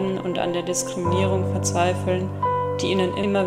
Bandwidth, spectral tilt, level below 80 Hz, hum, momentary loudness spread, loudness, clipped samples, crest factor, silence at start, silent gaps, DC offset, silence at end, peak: 14.5 kHz; -5 dB/octave; -54 dBFS; none; 3 LU; -23 LUFS; under 0.1%; 16 dB; 0 s; none; under 0.1%; 0 s; -8 dBFS